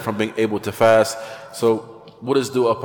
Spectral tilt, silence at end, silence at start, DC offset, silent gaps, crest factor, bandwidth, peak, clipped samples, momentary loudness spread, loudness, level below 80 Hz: -5 dB/octave; 0 s; 0 s; under 0.1%; none; 18 dB; 19 kHz; -2 dBFS; under 0.1%; 14 LU; -19 LUFS; -60 dBFS